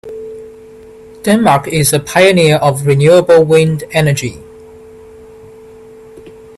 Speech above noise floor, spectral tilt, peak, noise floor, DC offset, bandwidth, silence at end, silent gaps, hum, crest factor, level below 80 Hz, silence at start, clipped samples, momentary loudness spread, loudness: 26 dB; -5 dB/octave; 0 dBFS; -36 dBFS; under 0.1%; 14 kHz; 0.3 s; none; none; 12 dB; -44 dBFS; 0.05 s; under 0.1%; 18 LU; -10 LUFS